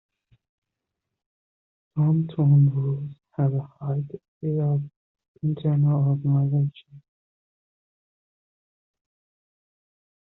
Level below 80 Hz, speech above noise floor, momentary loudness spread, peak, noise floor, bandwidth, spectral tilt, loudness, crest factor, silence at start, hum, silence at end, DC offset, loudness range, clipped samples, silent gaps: -64 dBFS; 62 dB; 13 LU; -10 dBFS; -84 dBFS; 3.9 kHz; -11.5 dB/octave; -24 LUFS; 16 dB; 1.95 s; none; 3.4 s; under 0.1%; 4 LU; under 0.1%; 4.28-4.41 s, 4.96-5.15 s, 5.28-5.34 s